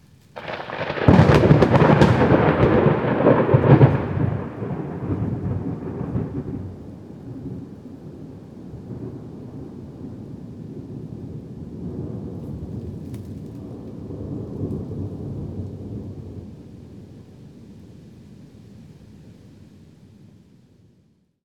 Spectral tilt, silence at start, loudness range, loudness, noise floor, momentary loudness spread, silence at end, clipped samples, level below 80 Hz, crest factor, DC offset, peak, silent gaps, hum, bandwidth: -8.5 dB/octave; 0.35 s; 21 LU; -20 LUFS; -61 dBFS; 24 LU; 1.95 s; under 0.1%; -40 dBFS; 22 dB; under 0.1%; 0 dBFS; none; none; 8.8 kHz